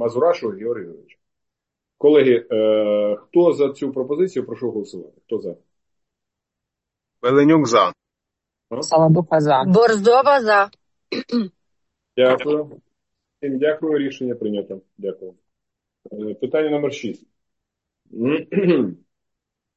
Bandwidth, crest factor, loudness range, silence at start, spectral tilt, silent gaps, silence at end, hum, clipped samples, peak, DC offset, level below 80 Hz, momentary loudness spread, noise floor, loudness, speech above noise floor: 8.6 kHz; 18 dB; 10 LU; 0 s; -6.5 dB/octave; none; 0.85 s; none; under 0.1%; -2 dBFS; under 0.1%; -66 dBFS; 17 LU; -84 dBFS; -18 LUFS; 65 dB